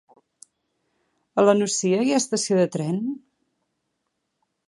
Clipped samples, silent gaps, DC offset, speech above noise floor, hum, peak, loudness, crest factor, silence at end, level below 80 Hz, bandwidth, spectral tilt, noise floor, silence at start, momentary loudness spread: under 0.1%; none; under 0.1%; 56 dB; none; -4 dBFS; -22 LUFS; 22 dB; 1.5 s; -74 dBFS; 11.5 kHz; -4.5 dB/octave; -77 dBFS; 1.35 s; 10 LU